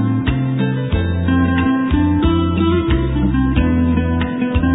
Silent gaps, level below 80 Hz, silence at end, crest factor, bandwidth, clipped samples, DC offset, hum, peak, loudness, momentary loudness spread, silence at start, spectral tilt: none; -24 dBFS; 0 s; 14 dB; 4 kHz; under 0.1%; under 0.1%; none; -2 dBFS; -16 LUFS; 3 LU; 0 s; -11.5 dB/octave